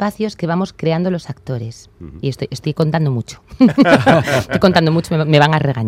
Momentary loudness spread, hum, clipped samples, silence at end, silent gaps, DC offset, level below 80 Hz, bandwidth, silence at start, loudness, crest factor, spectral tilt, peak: 14 LU; none; under 0.1%; 0 s; none; under 0.1%; -46 dBFS; 15 kHz; 0 s; -15 LUFS; 16 dB; -6.5 dB/octave; 0 dBFS